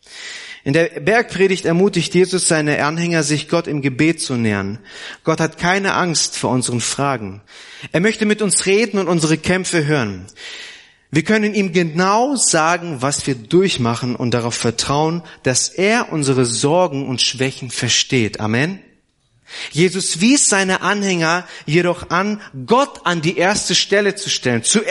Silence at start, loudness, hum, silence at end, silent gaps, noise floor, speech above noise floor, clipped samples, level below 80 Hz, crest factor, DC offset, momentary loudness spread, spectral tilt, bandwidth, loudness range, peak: 0.1 s; -16 LUFS; none; 0 s; none; -60 dBFS; 43 dB; under 0.1%; -52 dBFS; 16 dB; under 0.1%; 10 LU; -3.5 dB/octave; 11.5 kHz; 2 LU; -2 dBFS